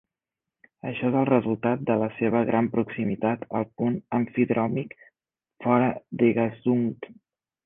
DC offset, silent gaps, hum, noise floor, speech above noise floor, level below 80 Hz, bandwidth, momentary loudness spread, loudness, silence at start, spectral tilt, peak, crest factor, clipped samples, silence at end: under 0.1%; none; none; -89 dBFS; 64 dB; -64 dBFS; 3.7 kHz; 9 LU; -25 LUFS; 0.85 s; -11 dB/octave; -6 dBFS; 20 dB; under 0.1%; 0.55 s